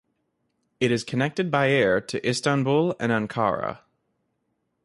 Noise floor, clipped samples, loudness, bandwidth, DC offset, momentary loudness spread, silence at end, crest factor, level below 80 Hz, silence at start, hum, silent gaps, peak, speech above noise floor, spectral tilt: -75 dBFS; under 0.1%; -24 LUFS; 11.5 kHz; under 0.1%; 6 LU; 1.1 s; 18 dB; -60 dBFS; 0.8 s; none; none; -8 dBFS; 52 dB; -5.5 dB/octave